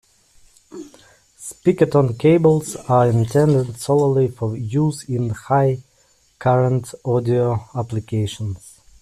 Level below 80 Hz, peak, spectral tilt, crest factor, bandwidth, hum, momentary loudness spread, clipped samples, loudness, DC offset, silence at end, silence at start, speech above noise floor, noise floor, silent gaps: -52 dBFS; -4 dBFS; -7.5 dB/octave; 16 dB; 14 kHz; none; 13 LU; under 0.1%; -19 LUFS; under 0.1%; 0.35 s; 0.75 s; 40 dB; -58 dBFS; none